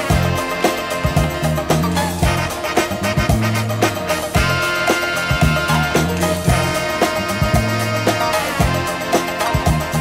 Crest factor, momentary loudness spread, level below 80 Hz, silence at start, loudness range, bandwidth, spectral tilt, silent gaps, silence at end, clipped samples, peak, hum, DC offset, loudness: 16 dB; 3 LU; -28 dBFS; 0 s; 1 LU; 16.5 kHz; -5 dB/octave; none; 0 s; under 0.1%; -2 dBFS; none; under 0.1%; -17 LUFS